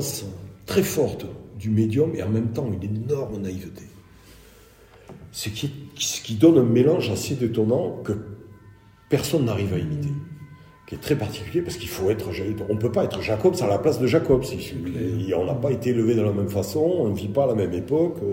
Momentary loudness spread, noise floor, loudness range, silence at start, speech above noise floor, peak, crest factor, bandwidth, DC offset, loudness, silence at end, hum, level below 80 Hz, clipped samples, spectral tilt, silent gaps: 12 LU; -50 dBFS; 6 LU; 0 s; 28 dB; -4 dBFS; 20 dB; 16.5 kHz; under 0.1%; -23 LUFS; 0 s; none; -52 dBFS; under 0.1%; -6 dB/octave; none